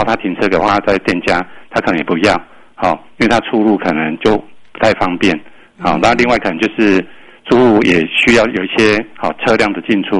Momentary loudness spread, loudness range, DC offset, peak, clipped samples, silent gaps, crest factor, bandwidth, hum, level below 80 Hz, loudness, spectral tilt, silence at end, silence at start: 8 LU; 3 LU; under 0.1%; 0 dBFS; under 0.1%; none; 14 dB; 11 kHz; none; -40 dBFS; -13 LUFS; -5.5 dB/octave; 0 s; 0 s